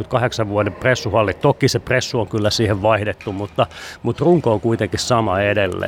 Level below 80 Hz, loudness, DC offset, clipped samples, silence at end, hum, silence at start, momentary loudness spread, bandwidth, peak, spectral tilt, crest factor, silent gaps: -44 dBFS; -18 LUFS; under 0.1%; under 0.1%; 0 s; none; 0 s; 6 LU; 16 kHz; -2 dBFS; -5.5 dB/octave; 16 dB; none